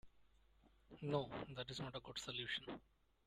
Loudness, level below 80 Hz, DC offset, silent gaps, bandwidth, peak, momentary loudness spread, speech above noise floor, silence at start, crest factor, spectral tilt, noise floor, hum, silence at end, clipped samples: -47 LUFS; -72 dBFS; under 0.1%; none; 13.5 kHz; -26 dBFS; 11 LU; 26 dB; 0.05 s; 22 dB; -4.5 dB/octave; -73 dBFS; none; 0.45 s; under 0.1%